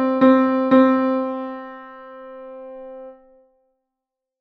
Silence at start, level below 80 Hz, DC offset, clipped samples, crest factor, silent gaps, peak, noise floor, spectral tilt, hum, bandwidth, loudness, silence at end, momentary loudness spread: 0 s; -64 dBFS; under 0.1%; under 0.1%; 18 dB; none; -2 dBFS; -84 dBFS; -8 dB/octave; none; 4.9 kHz; -17 LUFS; 1.3 s; 24 LU